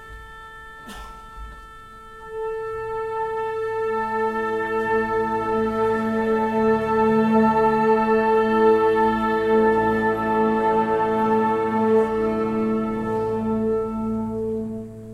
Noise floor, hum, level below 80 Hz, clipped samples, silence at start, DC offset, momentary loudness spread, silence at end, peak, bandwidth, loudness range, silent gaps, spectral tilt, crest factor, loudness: -41 dBFS; none; -46 dBFS; under 0.1%; 0 s; under 0.1%; 21 LU; 0 s; -8 dBFS; 12 kHz; 9 LU; none; -7.5 dB/octave; 14 dB; -21 LUFS